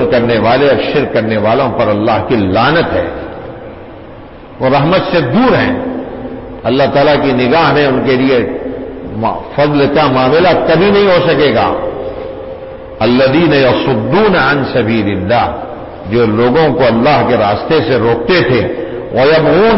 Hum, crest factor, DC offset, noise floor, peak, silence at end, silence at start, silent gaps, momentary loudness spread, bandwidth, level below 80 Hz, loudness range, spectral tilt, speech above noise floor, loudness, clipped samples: none; 10 dB; under 0.1%; -31 dBFS; 0 dBFS; 0 s; 0 s; none; 15 LU; 5.8 kHz; -36 dBFS; 3 LU; -10.5 dB/octave; 21 dB; -11 LUFS; under 0.1%